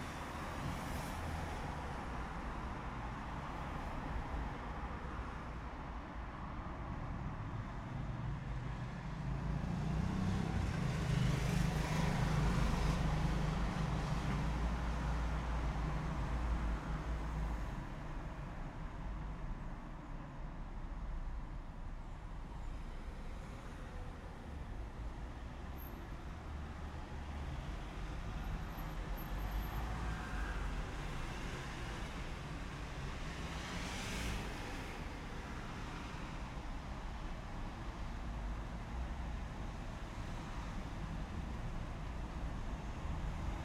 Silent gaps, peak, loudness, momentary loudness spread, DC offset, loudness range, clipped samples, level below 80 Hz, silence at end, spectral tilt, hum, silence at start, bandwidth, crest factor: none; -22 dBFS; -43 LUFS; 12 LU; under 0.1%; 12 LU; under 0.1%; -44 dBFS; 0 s; -6 dB/octave; none; 0 s; 14.5 kHz; 18 dB